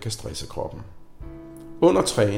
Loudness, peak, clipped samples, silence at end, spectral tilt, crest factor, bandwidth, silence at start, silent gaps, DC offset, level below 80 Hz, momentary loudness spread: -23 LUFS; -6 dBFS; under 0.1%; 0 s; -5 dB/octave; 18 dB; 16.5 kHz; 0 s; none; under 0.1%; -46 dBFS; 24 LU